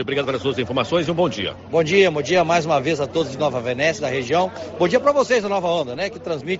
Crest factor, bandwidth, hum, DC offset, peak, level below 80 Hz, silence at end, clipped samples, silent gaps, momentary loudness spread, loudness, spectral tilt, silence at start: 16 dB; 8 kHz; none; under 0.1%; -4 dBFS; -56 dBFS; 0 s; under 0.1%; none; 7 LU; -20 LUFS; -3.5 dB/octave; 0 s